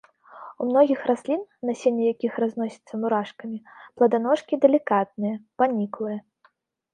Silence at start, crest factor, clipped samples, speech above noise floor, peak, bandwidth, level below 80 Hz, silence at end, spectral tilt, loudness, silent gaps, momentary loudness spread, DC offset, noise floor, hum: 0.35 s; 20 dB; under 0.1%; 40 dB; -4 dBFS; 9.8 kHz; -76 dBFS; 0.75 s; -7 dB/octave; -24 LUFS; none; 14 LU; under 0.1%; -64 dBFS; none